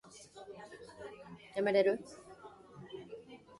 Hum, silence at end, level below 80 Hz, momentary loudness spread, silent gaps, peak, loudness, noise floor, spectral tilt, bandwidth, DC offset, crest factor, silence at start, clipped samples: none; 0.25 s; -76 dBFS; 24 LU; none; -16 dBFS; -33 LUFS; -55 dBFS; -5 dB/octave; 11.5 kHz; under 0.1%; 22 dB; 0.15 s; under 0.1%